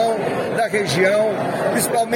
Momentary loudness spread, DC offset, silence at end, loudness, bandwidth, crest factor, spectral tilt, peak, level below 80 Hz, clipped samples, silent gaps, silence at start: 5 LU; under 0.1%; 0 s; -19 LUFS; 16.5 kHz; 14 dB; -4 dB/octave; -4 dBFS; -58 dBFS; under 0.1%; none; 0 s